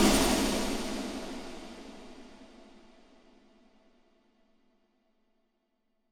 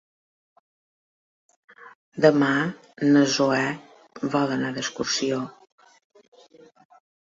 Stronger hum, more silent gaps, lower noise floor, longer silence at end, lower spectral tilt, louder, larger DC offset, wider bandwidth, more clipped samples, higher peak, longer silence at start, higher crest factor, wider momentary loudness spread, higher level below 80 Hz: neither; second, none vs 1.95-2.12 s; first, -77 dBFS vs -53 dBFS; first, 3.35 s vs 1.7 s; about the same, -3.5 dB/octave vs -4.5 dB/octave; second, -31 LUFS vs -23 LUFS; neither; first, over 20 kHz vs 7.8 kHz; neither; second, -12 dBFS vs -4 dBFS; second, 0 s vs 1.8 s; about the same, 24 dB vs 22 dB; first, 27 LU vs 13 LU; first, -46 dBFS vs -68 dBFS